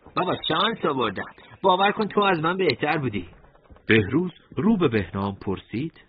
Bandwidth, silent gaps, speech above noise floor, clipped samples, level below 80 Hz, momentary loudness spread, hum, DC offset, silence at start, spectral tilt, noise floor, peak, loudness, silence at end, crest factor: 5.2 kHz; none; 28 dB; under 0.1%; -54 dBFS; 11 LU; none; under 0.1%; 0.05 s; -10 dB/octave; -51 dBFS; -4 dBFS; -23 LUFS; 0.2 s; 20 dB